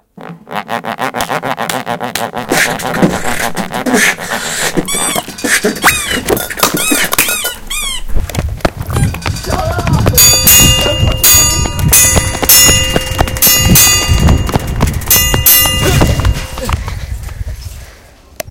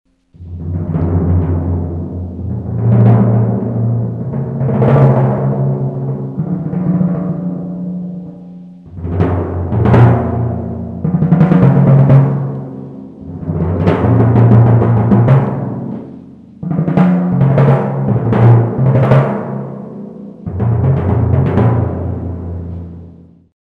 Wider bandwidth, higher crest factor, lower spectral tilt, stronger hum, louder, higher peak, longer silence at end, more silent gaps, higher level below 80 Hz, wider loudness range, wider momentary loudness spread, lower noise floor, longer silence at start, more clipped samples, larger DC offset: first, over 20 kHz vs 3.9 kHz; about the same, 12 dB vs 12 dB; second, -2.5 dB/octave vs -11.5 dB/octave; neither; first, -9 LUFS vs -13 LUFS; about the same, 0 dBFS vs 0 dBFS; second, 0 s vs 0.45 s; neither; first, -20 dBFS vs -34 dBFS; first, 8 LU vs 5 LU; second, 14 LU vs 18 LU; about the same, -38 dBFS vs -38 dBFS; second, 0.15 s vs 0.4 s; first, 1% vs 0.1%; neither